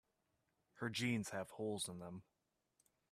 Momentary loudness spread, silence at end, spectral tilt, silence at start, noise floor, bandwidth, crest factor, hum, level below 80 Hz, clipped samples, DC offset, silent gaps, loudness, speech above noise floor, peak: 13 LU; 0.9 s; -4.5 dB/octave; 0.75 s; -85 dBFS; 14.5 kHz; 20 dB; none; -82 dBFS; under 0.1%; under 0.1%; none; -44 LUFS; 41 dB; -28 dBFS